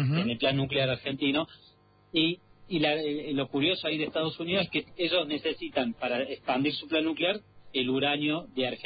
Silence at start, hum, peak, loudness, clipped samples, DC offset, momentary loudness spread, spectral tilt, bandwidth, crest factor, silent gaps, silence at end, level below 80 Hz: 0 s; none; -14 dBFS; -29 LUFS; under 0.1%; under 0.1%; 5 LU; -9.5 dB/octave; 5 kHz; 16 dB; none; 0 s; -62 dBFS